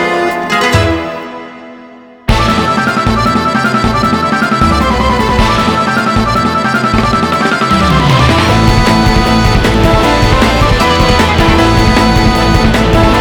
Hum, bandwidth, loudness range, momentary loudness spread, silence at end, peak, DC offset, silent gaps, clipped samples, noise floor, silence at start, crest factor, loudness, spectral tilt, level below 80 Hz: none; 19.5 kHz; 4 LU; 4 LU; 0 s; 0 dBFS; under 0.1%; none; 0.4%; -34 dBFS; 0 s; 10 dB; -9 LUFS; -5.5 dB/octave; -18 dBFS